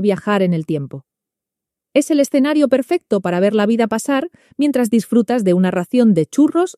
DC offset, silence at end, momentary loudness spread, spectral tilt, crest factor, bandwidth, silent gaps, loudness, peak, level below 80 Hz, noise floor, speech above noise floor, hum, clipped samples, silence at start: under 0.1%; 0.05 s; 6 LU; -6.5 dB/octave; 16 dB; 14.5 kHz; none; -16 LUFS; 0 dBFS; -64 dBFS; -85 dBFS; 69 dB; none; under 0.1%; 0 s